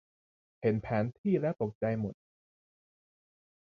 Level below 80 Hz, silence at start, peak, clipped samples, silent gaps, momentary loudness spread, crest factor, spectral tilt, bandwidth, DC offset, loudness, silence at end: -62 dBFS; 0.6 s; -16 dBFS; under 0.1%; 1.18-1.24 s, 1.75-1.81 s; 4 LU; 18 dB; -10.5 dB/octave; 6.2 kHz; under 0.1%; -33 LUFS; 1.5 s